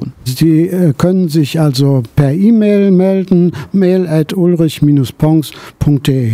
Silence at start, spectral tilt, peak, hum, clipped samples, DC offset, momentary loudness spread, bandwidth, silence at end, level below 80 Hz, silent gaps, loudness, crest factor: 0 s; -7.5 dB/octave; 0 dBFS; none; under 0.1%; under 0.1%; 5 LU; 16 kHz; 0 s; -38 dBFS; none; -11 LUFS; 10 dB